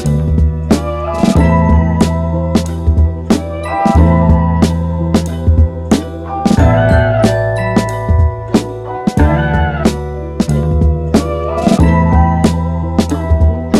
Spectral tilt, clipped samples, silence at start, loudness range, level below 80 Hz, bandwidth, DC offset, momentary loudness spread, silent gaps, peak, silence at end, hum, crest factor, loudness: -7.5 dB/octave; under 0.1%; 0 s; 2 LU; -18 dBFS; 12.5 kHz; under 0.1%; 6 LU; none; 0 dBFS; 0 s; none; 12 dB; -13 LUFS